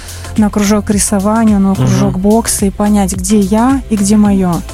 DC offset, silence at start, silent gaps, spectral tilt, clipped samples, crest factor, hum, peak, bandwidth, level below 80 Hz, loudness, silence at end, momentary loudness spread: under 0.1%; 0 s; none; -5.5 dB/octave; under 0.1%; 10 dB; none; 0 dBFS; 16 kHz; -26 dBFS; -11 LUFS; 0 s; 3 LU